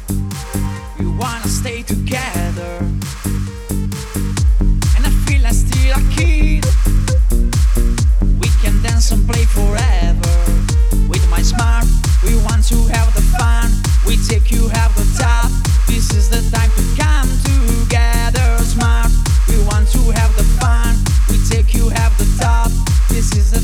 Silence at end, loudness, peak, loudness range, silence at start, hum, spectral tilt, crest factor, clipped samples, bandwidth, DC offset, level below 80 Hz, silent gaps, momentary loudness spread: 0 s; -15 LUFS; 0 dBFS; 4 LU; 0 s; none; -5 dB/octave; 12 dB; under 0.1%; 16 kHz; under 0.1%; -12 dBFS; none; 7 LU